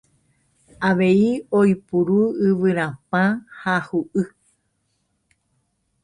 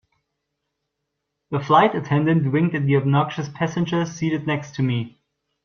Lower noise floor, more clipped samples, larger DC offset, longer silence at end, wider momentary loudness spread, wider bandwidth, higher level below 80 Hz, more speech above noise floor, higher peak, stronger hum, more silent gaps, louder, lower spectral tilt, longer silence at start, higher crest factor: second, -70 dBFS vs -79 dBFS; neither; neither; first, 1.75 s vs 0.55 s; about the same, 8 LU vs 10 LU; first, 10 kHz vs 6.8 kHz; about the same, -60 dBFS vs -60 dBFS; second, 51 dB vs 59 dB; about the same, -6 dBFS vs -4 dBFS; neither; neither; about the same, -20 LUFS vs -21 LUFS; about the same, -8 dB/octave vs -7 dB/octave; second, 0.8 s vs 1.5 s; about the same, 16 dB vs 18 dB